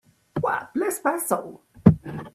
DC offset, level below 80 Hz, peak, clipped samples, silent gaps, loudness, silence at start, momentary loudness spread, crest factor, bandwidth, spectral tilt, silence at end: under 0.1%; -48 dBFS; 0 dBFS; under 0.1%; none; -24 LUFS; 0.35 s; 11 LU; 24 dB; 15.5 kHz; -7 dB/octave; 0.05 s